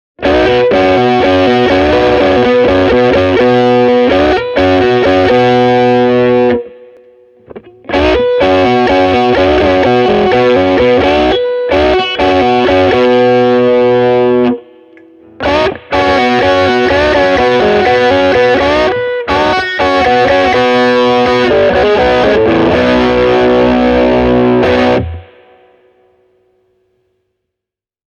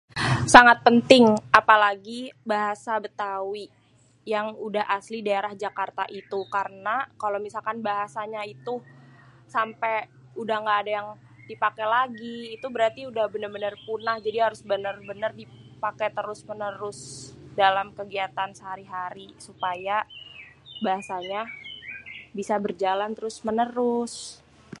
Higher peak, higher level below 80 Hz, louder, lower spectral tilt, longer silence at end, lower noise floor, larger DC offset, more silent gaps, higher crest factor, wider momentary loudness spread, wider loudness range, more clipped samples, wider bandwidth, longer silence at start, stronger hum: about the same, 0 dBFS vs 0 dBFS; first, -32 dBFS vs -58 dBFS; first, -9 LUFS vs -24 LUFS; first, -6.5 dB/octave vs -4 dB/octave; first, 2.95 s vs 0.45 s; first, -83 dBFS vs -51 dBFS; neither; neither; second, 10 dB vs 26 dB; second, 3 LU vs 19 LU; second, 3 LU vs 10 LU; neither; second, 8.8 kHz vs 11.5 kHz; about the same, 0.2 s vs 0.15 s; neither